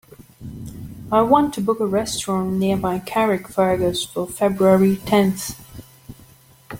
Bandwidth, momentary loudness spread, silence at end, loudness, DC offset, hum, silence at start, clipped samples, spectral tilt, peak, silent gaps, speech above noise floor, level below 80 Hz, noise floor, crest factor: 17 kHz; 20 LU; 0 s; -19 LUFS; under 0.1%; none; 0.4 s; under 0.1%; -5.5 dB/octave; -2 dBFS; none; 31 dB; -48 dBFS; -49 dBFS; 18 dB